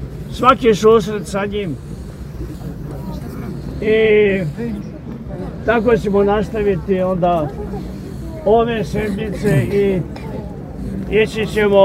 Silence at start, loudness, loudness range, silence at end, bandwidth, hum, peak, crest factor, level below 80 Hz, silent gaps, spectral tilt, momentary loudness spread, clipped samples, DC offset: 0 s; -17 LUFS; 2 LU; 0 s; 15 kHz; none; 0 dBFS; 16 dB; -34 dBFS; none; -6.5 dB/octave; 16 LU; under 0.1%; under 0.1%